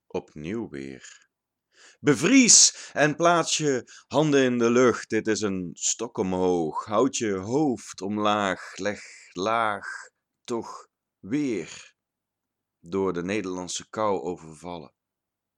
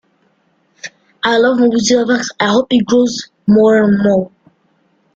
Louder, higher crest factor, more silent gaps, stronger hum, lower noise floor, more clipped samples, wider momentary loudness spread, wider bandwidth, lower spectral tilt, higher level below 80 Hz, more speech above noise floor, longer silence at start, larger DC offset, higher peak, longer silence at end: second, -24 LUFS vs -12 LUFS; first, 24 dB vs 12 dB; neither; neither; first, -86 dBFS vs -58 dBFS; neither; about the same, 19 LU vs 20 LU; first, 13 kHz vs 7.8 kHz; second, -3 dB/octave vs -5 dB/octave; second, -68 dBFS vs -52 dBFS; first, 61 dB vs 47 dB; second, 0.15 s vs 0.85 s; neither; about the same, -2 dBFS vs 0 dBFS; second, 0.7 s vs 0.9 s